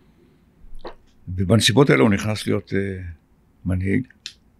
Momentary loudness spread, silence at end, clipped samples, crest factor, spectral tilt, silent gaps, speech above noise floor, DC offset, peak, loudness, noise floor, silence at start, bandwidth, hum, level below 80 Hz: 25 LU; 0.3 s; under 0.1%; 18 dB; -5.5 dB/octave; none; 36 dB; under 0.1%; -4 dBFS; -20 LUFS; -55 dBFS; 0.65 s; 13.5 kHz; none; -48 dBFS